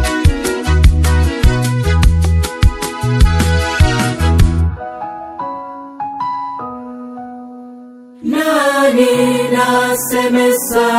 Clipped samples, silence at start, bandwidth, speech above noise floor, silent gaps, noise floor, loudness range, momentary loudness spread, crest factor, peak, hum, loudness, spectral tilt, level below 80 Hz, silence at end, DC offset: 0.2%; 0 s; 16.5 kHz; 23 dB; none; -36 dBFS; 10 LU; 16 LU; 14 dB; 0 dBFS; none; -14 LUFS; -5.5 dB/octave; -18 dBFS; 0 s; under 0.1%